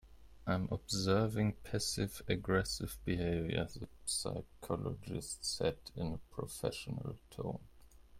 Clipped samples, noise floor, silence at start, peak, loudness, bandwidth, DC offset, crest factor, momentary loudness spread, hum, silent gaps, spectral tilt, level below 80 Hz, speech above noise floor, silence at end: under 0.1%; -58 dBFS; 0.05 s; -18 dBFS; -38 LUFS; 16.5 kHz; under 0.1%; 20 dB; 10 LU; none; none; -4.5 dB/octave; -56 dBFS; 20 dB; 0 s